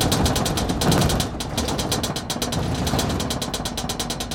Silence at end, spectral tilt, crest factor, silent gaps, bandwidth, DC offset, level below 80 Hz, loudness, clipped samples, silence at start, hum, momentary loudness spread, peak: 0 s; -4 dB/octave; 18 dB; none; 17 kHz; under 0.1%; -34 dBFS; -23 LUFS; under 0.1%; 0 s; none; 6 LU; -4 dBFS